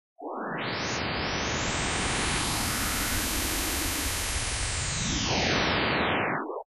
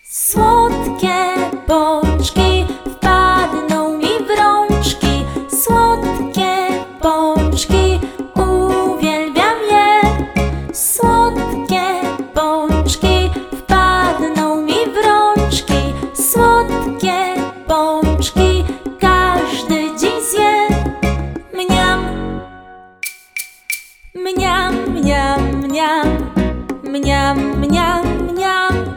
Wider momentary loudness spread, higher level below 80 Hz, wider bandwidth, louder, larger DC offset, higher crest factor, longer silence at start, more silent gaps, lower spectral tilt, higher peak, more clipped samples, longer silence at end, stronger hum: second, 5 LU vs 9 LU; second, -40 dBFS vs -24 dBFS; second, 13.5 kHz vs over 20 kHz; second, -27 LUFS vs -15 LUFS; first, 0.1% vs under 0.1%; about the same, 16 dB vs 14 dB; first, 0.2 s vs 0.05 s; neither; second, -2.5 dB/octave vs -4.5 dB/octave; second, -14 dBFS vs 0 dBFS; neither; about the same, 0.05 s vs 0 s; neither